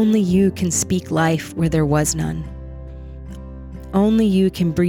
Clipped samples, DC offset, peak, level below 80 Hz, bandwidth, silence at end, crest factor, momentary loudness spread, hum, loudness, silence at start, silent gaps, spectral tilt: under 0.1%; under 0.1%; -6 dBFS; -36 dBFS; 17 kHz; 0 s; 14 dB; 20 LU; none; -18 LUFS; 0 s; none; -5.5 dB/octave